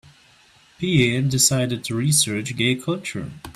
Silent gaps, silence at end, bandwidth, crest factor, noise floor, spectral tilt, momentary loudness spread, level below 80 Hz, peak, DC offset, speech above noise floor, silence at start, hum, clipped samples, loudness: none; 0.05 s; 15 kHz; 18 dB; -54 dBFS; -3.5 dB/octave; 11 LU; -52 dBFS; -4 dBFS; under 0.1%; 33 dB; 0.8 s; none; under 0.1%; -20 LUFS